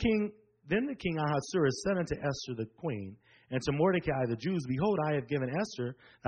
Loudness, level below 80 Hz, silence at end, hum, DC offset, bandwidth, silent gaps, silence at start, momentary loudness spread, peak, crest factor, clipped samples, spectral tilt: -33 LUFS; -56 dBFS; 0 s; none; under 0.1%; 8.8 kHz; none; 0 s; 9 LU; -16 dBFS; 16 dB; under 0.1%; -6.5 dB/octave